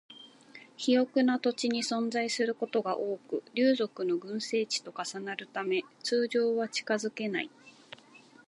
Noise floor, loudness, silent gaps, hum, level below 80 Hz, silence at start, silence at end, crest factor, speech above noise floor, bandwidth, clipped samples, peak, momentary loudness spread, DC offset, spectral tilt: -57 dBFS; -31 LUFS; none; none; -86 dBFS; 0.1 s; 0.8 s; 16 dB; 26 dB; 11.5 kHz; under 0.1%; -14 dBFS; 17 LU; under 0.1%; -3.5 dB/octave